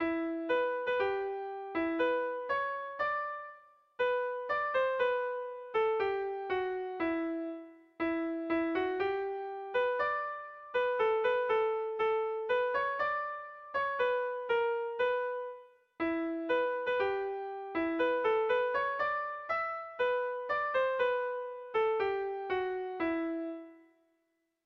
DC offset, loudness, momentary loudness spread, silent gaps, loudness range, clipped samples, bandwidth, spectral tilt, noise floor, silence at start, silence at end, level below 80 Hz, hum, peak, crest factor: under 0.1%; -33 LUFS; 8 LU; none; 3 LU; under 0.1%; 6 kHz; -6 dB/octave; -79 dBFS; 0 s; 0.85 s; -70 dBFS; none; -20 dBFS; 14 dB